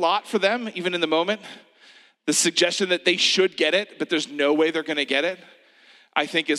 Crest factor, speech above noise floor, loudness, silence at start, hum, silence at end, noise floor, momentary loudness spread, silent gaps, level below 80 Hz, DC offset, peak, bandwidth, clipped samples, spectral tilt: 20 dB; 32 dB; -22 LUFS; 0 s; none; 0 s; -54 dBFS; 9 LU; none; -84 dBFS; under 0.1%; -4 dBFS; 14.5 kHz; under 0.1%; -2 dB/octave